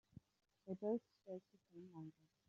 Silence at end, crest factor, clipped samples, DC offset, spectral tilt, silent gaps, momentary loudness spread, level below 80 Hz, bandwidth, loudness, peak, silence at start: 0.35 s; 20 dB; under 0.1%; under 0.1%; -10 dB/octave; none; 21 LU; -86 dBFS; 7.2 kHz; -50 LUFS; -32 dBFS; 0.65 s